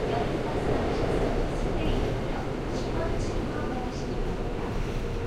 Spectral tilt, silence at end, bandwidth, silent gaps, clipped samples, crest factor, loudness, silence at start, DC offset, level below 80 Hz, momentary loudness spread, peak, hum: -6.5 dB/octave; 0 s; 12 kHz; none; under 0.1%; 14 dB; -30 LUFS; 0 s; under 0.1%; -32 dBFS; 5 LU; -14 dBFS; none